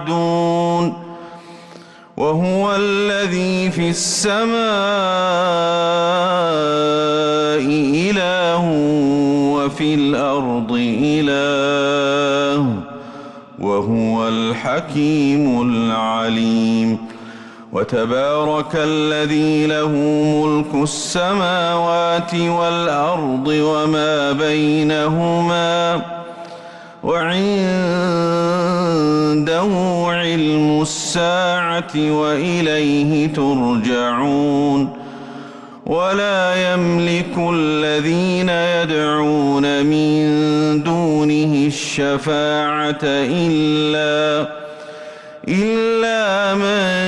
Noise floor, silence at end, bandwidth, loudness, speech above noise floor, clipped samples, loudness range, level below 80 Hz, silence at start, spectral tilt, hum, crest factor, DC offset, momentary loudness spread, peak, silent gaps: -40 dBFS; 0 s; 12 kHz; -17 LUFS; 24 dB; under 0.1%; 2 LU; -52 dBFS; 0 s; -5 dB/octave; none; 10 dB; under 0.1%; 6 LU; -8 dBFS; none